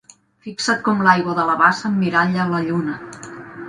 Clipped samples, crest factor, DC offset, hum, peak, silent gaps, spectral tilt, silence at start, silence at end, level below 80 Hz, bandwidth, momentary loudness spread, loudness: under 0.1%; 20 dB; under 0.1%; none; 0 dBFS; none; -5 dB/octave; 0.45 s; 0 s; -60 dBFS; 10.5 kHz; 19 LU; -18 LUFS